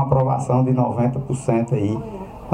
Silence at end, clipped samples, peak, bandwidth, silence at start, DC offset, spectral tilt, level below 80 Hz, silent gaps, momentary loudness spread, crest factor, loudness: 0 s; under 0.1%; -2 dBFS; 10 kHz; 0 s; under 0.1%; -9 dB/octave; -44 dBFS; none; 9 LU; 16 dB; -20 LUFS